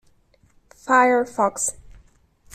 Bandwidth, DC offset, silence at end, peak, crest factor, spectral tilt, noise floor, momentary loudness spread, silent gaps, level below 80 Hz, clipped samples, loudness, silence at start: 15 kHz; under 0.1%; 0.85 s; -4 dBFS; 20 dB; -3 dB/octave; -58 dBFS; 10 LU; none; -54 dBFS; under 0.1%; -20 LUFS; 0.85 s